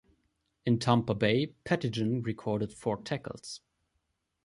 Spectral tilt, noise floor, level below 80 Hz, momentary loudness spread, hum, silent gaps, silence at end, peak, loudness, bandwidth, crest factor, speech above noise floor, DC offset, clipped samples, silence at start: -6.5 dB/octave; -80 dBFS; -62 dBFS; 14 LU; none; none; 0.9 s; -10 dBFS; -31 LUFS; 11.5 kHz; 22 dB; 49 dB; under 0.1%; under 0.1%; 0.65 s